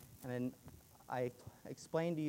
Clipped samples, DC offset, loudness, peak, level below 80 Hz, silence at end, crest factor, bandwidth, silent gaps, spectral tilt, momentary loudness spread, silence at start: under 0.1%; under 0.1%; -43 LUFS; -24 dBFS; -72 dBFS; 0 s; 18 dB; 16 kHz; none; -6.5 dB/octave; 19 LU; 0 s